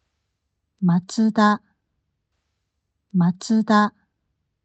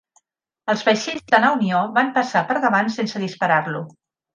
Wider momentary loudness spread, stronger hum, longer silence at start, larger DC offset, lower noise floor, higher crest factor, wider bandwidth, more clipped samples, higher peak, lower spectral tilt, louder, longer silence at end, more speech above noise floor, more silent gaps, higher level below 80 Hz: second, 7 LU vs 10 LU; neither; first, 0.8 s vs 0.65 s; neither; first, -76 dBFS vs -66 dBFS; about the same, 18 dB vs 20 dB; second, 8.6 kHz vs 9.6 kHz; neither; second, -6 dBFS vs 0 dBFS; first, -6.5 dB/octave vs -5 dB/octave; about the same, -20 LUFS vs -19 LUFS; first, 0.8 s vs 0.45 s; first, 58 dB vs 47 dB; neither; about the same, -72 dBFS vs -68 dBFS